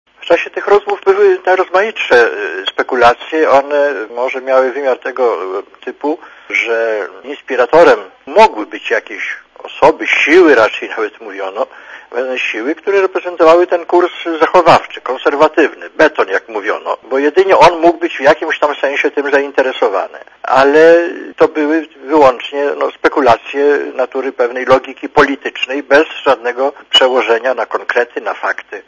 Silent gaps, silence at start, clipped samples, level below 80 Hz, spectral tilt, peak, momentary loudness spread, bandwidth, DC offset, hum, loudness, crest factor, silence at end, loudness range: none; 0.2 s; 0.7%; -48 dBFS; -4 dB/octave; 0 dBFS; 12 LU; 10.5 kHz; under 0.1%; none; -12 LUFS; 12 dB; 0.05 s; 3 LU